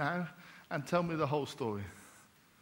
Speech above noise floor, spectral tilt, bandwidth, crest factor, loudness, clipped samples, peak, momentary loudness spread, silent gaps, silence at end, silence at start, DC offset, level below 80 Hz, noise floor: 27 dB; -6.5 dB/octave; 16.5 kHz; 22 dB; -36 LUFS; under 0.1%; -16 dBFS; 20 LU; none; 0.4 s; 0 s; under 0.1%; -70 dBFS; -62 dBFS